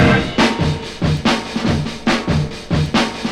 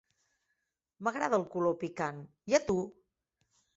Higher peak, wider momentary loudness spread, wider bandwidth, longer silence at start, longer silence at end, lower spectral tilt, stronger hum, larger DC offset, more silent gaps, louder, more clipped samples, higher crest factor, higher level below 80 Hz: first, 0 dBFS vs -12 dBFS; second, 6 LU vs 9 LU; first, 12.5 kHz vs 8 kHz; second, 0 s vs 1 s; second, 0 s vs 0.85 s; about the same, -5.5 dB/octave vs -5 dB/octave; neither; neither; neither; first, -17 LUFS vs -33 LUFS; neither; second, 16 dB vs 22 dB; first, -32 dBFS vs -66 dBFS